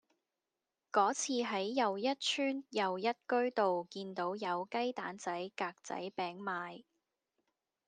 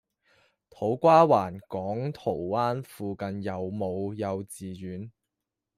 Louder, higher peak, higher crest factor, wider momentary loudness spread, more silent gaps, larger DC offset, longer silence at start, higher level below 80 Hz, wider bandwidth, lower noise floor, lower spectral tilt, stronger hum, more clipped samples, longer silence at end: second, -36 LUFS vs -27 LUFS; second, -16 dBFS vs -6 dBFS; about the same, 22 dB vs 22 dB; second, 9 LU vs 19 LU; neither; neither; first, 0.95 s vs 0.8 s; second, under -90 dBFS vs -68 dBFS; second, 10 kHz vs 15 kHz; first, under -90 dBFS vs -86 dBFS; second, -3 dB/octave vs -7 dB/octave; neither; neither; first, 1.05 s vs 0.7 s